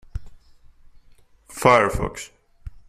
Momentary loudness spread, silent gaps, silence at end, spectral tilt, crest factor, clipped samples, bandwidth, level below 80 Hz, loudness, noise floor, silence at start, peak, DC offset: 24 LU; none; 0.1 s; -5 dB/octave; 22 dB; under 0.1%; 15 kHz; -40 dBFS; -19 LUFS; -52 dBFS; 0.15 s; -2 dBFS; under 0.1%